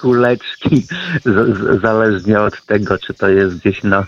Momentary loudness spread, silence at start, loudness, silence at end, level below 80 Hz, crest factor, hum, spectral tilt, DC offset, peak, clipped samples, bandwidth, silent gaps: 5 LU; 0 s; -14 LUFS; 0 s; -44 dBFS; 14 dB; none; -7.5 dB/octave; under 0.1%; 0 dBFS; under 0.1%; 7.2 kHz; none